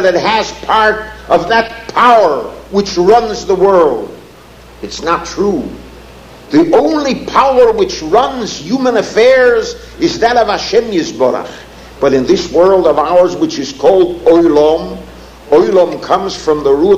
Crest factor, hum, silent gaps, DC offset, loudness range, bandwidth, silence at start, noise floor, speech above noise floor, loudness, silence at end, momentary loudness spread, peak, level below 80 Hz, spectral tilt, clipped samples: 10 dB; none; none; under 0.1%; 3 LU; 14.5 kHz; 0 s; -36 dBFS; 26 dB; -11 LUFS; 0 s; 11 LU; 0 dBFS; -38 dBFS; -4.5 dB/octave; 0.2%